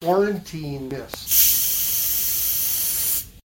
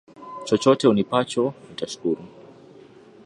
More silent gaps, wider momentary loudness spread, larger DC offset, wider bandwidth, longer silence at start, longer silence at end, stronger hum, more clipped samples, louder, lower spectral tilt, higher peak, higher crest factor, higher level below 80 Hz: neither; about the same, 16 LU vs 16 LU; neither; first, 16.5 kHz vs 11 kHz; second, 0 s vs 0.2 s; second, 0.05 s vs 1 s; neither; neither; first, -18 LUFS vs -22 LUFS; second, -2 dB/octave vs -5.5 dB/octave; about the same, -2 dBFS vs -4 dBFS; about the same, 20 dB vs 20 dB; first, -48 dBFS vs -64 dBFS